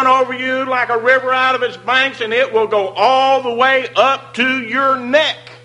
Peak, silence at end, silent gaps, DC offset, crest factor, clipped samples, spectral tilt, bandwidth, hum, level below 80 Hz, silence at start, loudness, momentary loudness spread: 0 dBFS; 0.1 s; none; under 0.1%; 14 dB; under 0.1%; -3.5 dB/octave; 11 kHz; none; -64 dBFS; 0 s; -14 LUFS; 4 LU